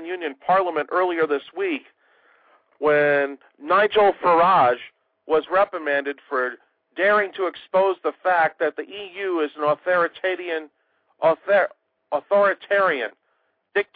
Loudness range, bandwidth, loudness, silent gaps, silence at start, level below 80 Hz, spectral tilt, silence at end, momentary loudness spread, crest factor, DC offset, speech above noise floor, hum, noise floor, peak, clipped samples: 4 LU; 4.9 kHz; -21 LUFS; none; 0 s; -68 dBFS; -8 dB/octave; 0.1 s; 11 LU; 14 dB; under 0.1%; 49 dB; none; -70 dBFS; -8 dBFS; under 0.1%